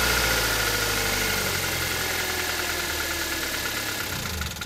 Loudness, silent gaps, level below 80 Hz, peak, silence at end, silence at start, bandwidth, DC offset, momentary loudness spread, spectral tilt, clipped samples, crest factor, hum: -24 LUFS; none; -40 dBFS; -10 dBFS; 0 s; 0 s; 16 kHz; under 0.1%; 6 LU; -2 dB/octave; under 0.1%; 16 dB; none